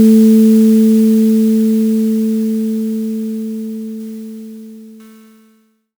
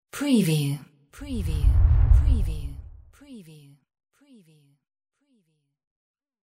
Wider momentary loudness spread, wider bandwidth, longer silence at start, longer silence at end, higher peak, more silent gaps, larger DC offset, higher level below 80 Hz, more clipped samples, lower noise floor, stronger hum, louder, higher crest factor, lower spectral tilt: second, 20 LU vs 25 LU; first, over 20 kHz vs 16 kHz; second, 0 s vs 0.15 s; second, 1.05 s vs 3.15 s; first, -2 dBFS vs -6 dBFS; neither; neither; second, -64 dBFS vs -26 dBFS; neither; second, -54 dBFS vs -70 dBFS; neither; first, -12 LUFS vs -24 LUFS; second, 12 dB vs 18 dB; about the same, -7.5 dB/octave vs -6.5 dB/octave